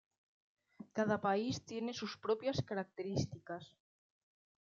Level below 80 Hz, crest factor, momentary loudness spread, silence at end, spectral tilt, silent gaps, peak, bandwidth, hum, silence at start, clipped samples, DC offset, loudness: -74 dBFS; 20 dB; 13 LU; 0.95 s; -5 dB/octave; none; -20 dBFS; 7.6 kHz; none; 0.8 s; under 0.1%; under 0.1%; -39 LUFS